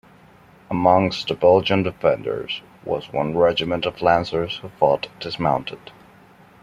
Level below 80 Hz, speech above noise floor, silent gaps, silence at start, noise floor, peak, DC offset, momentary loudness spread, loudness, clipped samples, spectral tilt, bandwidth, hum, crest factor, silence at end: -52 dBFS; 30 dB; none; 0.7 s; -50 dBFS; -2 dBFS; under 0.1%; 12 LU; -21 LUFS; under 0.1%; -6.5 dB/octave; 7.6 kHz; none; 20 dB; 0.7 s